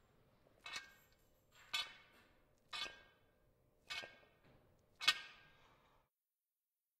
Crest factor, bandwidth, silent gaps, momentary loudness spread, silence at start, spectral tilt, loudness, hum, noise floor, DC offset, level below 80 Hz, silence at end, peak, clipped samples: 36 dB; 15.5 kHz; none; 26 LU; 0.65 s; 1 dB/octave; -43 LUFS; none; under -90 dBFS; under 0.1%; -80 dBFS; 1.55 s; -16 dBFS; under 0.1%